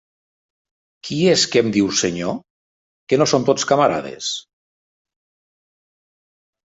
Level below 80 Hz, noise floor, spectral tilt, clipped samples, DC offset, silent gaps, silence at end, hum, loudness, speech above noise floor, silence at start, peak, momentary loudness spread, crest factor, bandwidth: -58 dBFS; under -90 dBFS; -4 dB/octave; under 0.1%; under 0.1%; 2.50-3.07 s; 2.35 s; none; -18 LUFS; over 72 dB; 1.05 s; -2 dBFS; 12 LU; 18 dB; 8 kHz